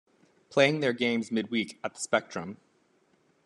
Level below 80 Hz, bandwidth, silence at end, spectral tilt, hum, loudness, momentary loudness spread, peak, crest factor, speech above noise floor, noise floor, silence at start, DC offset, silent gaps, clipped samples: -76 dBFS; 12 kHz; 0.9 s; -4.5 dB/octave; none; -28 LUFS; 14 LU; -6 dBFS; 24 dB; 39 dB; -68 dBFS; 0.5 s; under 0.1%; none; under 0.1%